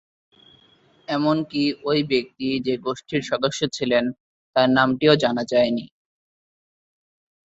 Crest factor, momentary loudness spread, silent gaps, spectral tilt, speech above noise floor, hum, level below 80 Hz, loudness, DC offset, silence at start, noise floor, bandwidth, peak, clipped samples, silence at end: 22 dB; 9 LU; 4.20-4.53 s; -5.5 dB/octave; 36 dB; none; -62 dBFS; -22 LUFS; under 0.1%; 1.1 s; -57 dBFS; 8 kHz; -2 dBFS; under 0.1%; 1.7 s